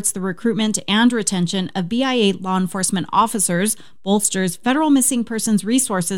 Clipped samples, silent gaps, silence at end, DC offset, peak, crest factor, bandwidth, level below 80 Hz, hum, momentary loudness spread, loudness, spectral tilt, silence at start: under 0.1%; none; 0 s; 1%; -2 dBFS; 18 dB; 17.5 kHz; -58 dBFS; none; 6 LU; -18 LUFS; -3.5 dB/octave; 0 s